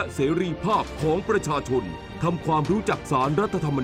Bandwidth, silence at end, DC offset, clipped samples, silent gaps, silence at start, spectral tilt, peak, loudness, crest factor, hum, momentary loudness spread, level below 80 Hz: 15.5 kHz; 0 s; under 0.1%; under 0.1%; none; 0 s; -6.5 dB/octave; -8 dBFS; -24 LUFS; 16 dB; none; 4 LU; -44 dBFS